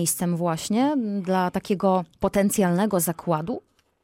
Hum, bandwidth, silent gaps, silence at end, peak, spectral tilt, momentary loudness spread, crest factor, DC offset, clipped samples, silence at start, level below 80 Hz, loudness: none; 16.5 kHz; none; 0.45 s; -10 dBFS; -5.5 dB/octave; 5 LU; 14 dB; under 0.1%; under 0.1%; 0 s; -54 dBFS; -24 LUFS